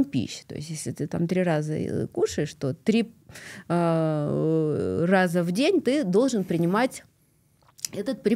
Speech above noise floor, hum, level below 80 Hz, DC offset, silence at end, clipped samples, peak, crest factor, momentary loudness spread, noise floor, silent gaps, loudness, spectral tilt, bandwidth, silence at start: 39 dB; none; -62 dBFS; under 0.1%; 0 s; under 0.1%; -6 dBFS; 18 dB; 12 LU; -64 dBFS; none; -25 LUFS; -6 dB/octave; 15.5 kHz; 0 s